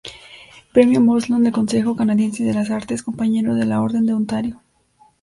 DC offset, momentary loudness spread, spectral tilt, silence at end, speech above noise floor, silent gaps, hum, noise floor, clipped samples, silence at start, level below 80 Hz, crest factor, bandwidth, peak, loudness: under 0.1%; 10 LU; -6.5 dB/octave; 0.65 s; 38 dB; none; none; -56 dBFS; under 0.1%; 0.05 s; -54 dBFS; 18 dB; 11.5 kHz; 0 dBFS; -18 LUFS